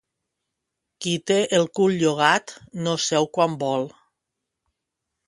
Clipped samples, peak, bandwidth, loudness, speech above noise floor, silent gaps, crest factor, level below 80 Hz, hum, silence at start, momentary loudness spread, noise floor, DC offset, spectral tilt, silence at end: under 0.1%; -2 dBFS; 11.5 kHz; -22 LUFS; 61 dB; none; 22 dB; -68 dBFS; none; 1 s; 10 LU; -82 dBFS; under 0.1%; -4 dB/octave; 1.4 s